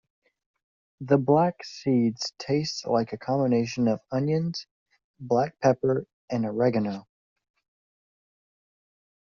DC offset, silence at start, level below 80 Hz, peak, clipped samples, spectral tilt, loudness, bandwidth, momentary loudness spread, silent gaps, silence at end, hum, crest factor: under 0.1%; 1 s; -64 dBFS; -6 dBFS; under 0.1%; -6.5 dB/octave; -26 LUFS; 7.4 kHz; 10 LU; 4.71-4.86 s, 5.04-5.14 s, 6.13-6.28 s; 2.35 s; none; 20 dB